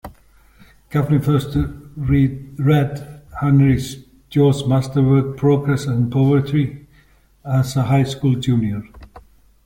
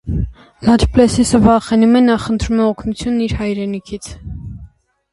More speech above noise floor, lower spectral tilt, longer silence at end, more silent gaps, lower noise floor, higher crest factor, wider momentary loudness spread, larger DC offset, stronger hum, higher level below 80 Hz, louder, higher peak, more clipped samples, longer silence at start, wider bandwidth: first, 36 dB vs 28 dB; first, -8 dB/octave vs -6 dB/octave; about the same, 0.45 s vs 0.45 s; neither; first, -53 dBFS vs -42 dBFS; about the same, 14 dB vs 14 dB; second, 10 LU vs 18 LU; neither; neither; second, -40 dBFS vs -28 dBFS; second, -18 LUFS vs -14 LUFS; second, -4 dBFS vs 0 dBFS; neither; about the same, 0.05 s vs 0.05 s; first, 16.5 kHz vs 11.5 kHz